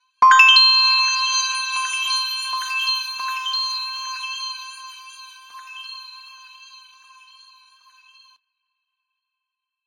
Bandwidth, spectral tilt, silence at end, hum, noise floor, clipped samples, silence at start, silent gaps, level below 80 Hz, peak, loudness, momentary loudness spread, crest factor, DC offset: 16 kHz; 5.5 dB/octave; 3.5 s; none; -84 dBFS; under 0.1%; 0.2 s; none; -74 dBFS; 0 dBFS; -16 LUFS; 26 LU; 22 dB; under 0.1%